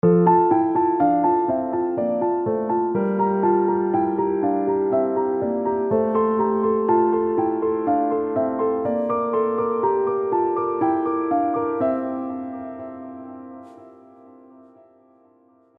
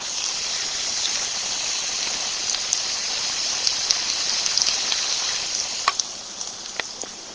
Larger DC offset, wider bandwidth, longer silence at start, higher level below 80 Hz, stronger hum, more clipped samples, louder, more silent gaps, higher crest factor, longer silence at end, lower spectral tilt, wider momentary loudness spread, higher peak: neither; second, 3.3 kHz vs 8 kHz; about the same, 0.05 s vs 0 s; about the same, -62 dBFS vs -58 dBFS; neither; neither; about the same, -21 LUFS vs -22 LUFS; neither; second, 18 dB vs 26 dB; first, 1.85 s vs 0 s; first, -12.5 dB/octave vs 2 dB/octave; about the same, 11 LU vs 10 LU; second, -4 dBFS vs 0 dBFS